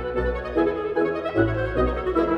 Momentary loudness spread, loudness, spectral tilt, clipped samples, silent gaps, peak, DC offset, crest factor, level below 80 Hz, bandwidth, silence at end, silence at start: 2 LU; -24 LUFS; -9 dB/octave; under 0.1%; none; -8 dBFS; under 0.1%; 16 dB; -34 dBFS; 6 kHz; 0 s; 0 s